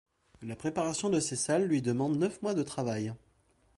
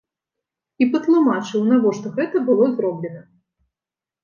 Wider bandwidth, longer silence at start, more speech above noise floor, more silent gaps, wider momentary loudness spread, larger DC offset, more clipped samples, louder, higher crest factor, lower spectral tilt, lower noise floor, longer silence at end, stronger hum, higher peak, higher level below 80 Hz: first, 11.5 kHz vs 7.2 kHz; second, 0.4 s vs 0.8 s; second, 37 dB vs 72 dB; neither; first, 11 LU vs 8 LU; neither; neither; second, -31 LUFS vs -19 LUFS; about the same, 16 dB vs 16 dB; second, -5 dB/octave vs -7 dB/octave; second, -68 dBFS vs -90 dBFS; second, 0.6 s vs 1 s; neither; second, -16 dBFS vs -4 dBFS; first, -66 dBFS vs -74 dBFS